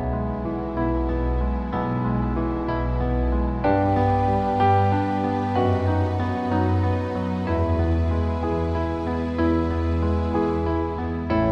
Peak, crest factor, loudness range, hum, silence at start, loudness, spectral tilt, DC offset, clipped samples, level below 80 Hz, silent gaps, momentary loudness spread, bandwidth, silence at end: -8 dBFS; 14 dB; 3 LU; none; 0 s; -23 LUFS; -9.5 dB/octave; under 0.1%; under 0.1%; -30 dBFS; none; 5 LU; 6.2 kHz; 0 s